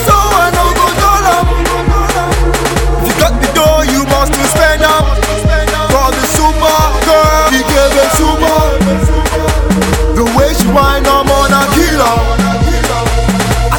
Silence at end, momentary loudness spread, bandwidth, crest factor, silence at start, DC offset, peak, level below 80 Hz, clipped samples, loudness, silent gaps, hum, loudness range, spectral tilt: 0 s; 4 LU; 18 kHz; 10 dB; 0 s; 0.4%; 0 dBFS; -16 dBFS; under 0.1%; -10 LUFS; none; none; 1 LU; -4.5 dB/octave